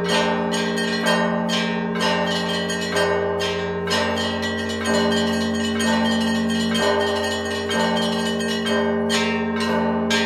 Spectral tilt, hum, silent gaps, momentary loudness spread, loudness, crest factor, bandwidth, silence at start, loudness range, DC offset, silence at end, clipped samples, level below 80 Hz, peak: -4 dB/octave; none; none; 3 LU; -21 LUFS; 16 dB; 15 kHz; 0 s; 1 LU; under 0.1%; 0 s; under 0.1%; -54 dBFS; -6 dBFS